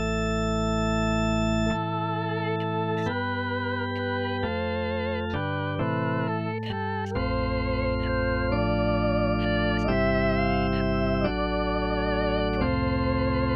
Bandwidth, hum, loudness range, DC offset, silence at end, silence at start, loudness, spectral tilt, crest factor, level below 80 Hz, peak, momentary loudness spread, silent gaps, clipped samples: 7.4 kHz; none; 3 LU; 0.2%; 0 s; 0 s; -26 LUFS; -7 dB/octave; 14 dB; -36 dBFS; -12 dBFS; 4 LU; none; under 0.1%